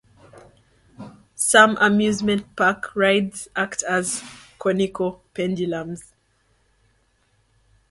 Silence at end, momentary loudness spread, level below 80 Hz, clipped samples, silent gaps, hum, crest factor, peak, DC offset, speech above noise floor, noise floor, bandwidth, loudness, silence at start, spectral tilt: 1.9 s; 20 LU; -58 dBFS; under 0.1%; none; none; 22 dB; 0 dBFS; under 0.1%; 44 dB; -64 dBFS; 12 kHz; -20 LUFS; 0.35 s; -3.5 dB/octave